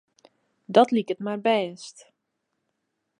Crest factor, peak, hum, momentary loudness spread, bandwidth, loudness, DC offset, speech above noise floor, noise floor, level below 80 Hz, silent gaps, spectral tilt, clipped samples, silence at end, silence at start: 24 dB; -2 dBFS; none; 19 LU; 10.5 kHz; -23 LUFS; under 0.1%; 56 dB; -79 dBFS; -80 dBFS; none; -5.5 dB/octave; under 0.1%; 1.3 s; 0.7 s